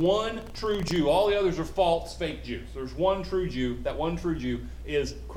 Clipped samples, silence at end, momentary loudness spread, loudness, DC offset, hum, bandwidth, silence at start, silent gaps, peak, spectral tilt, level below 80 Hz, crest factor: under 0.1%; 0 s; 10 LU; -28 LUFS; under 0.1%; none; 16.5 kHz; 0 s; none; -12 dBFS; -6 dB/octave; -40 dBFS; 16 dB